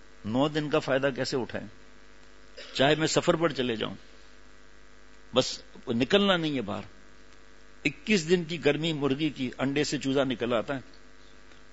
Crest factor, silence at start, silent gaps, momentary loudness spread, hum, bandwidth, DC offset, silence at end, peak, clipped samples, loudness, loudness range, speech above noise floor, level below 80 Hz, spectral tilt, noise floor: 22 dB; 0.25 s; none; 13 LU; none; 8 kHz; 0.4%; 0.9 s; -8 dBFS; under 0.1%; -28 LUFS; 2 LU; 28 dB; -56 dBFS; -4.5 dB/octave; -55 dBFS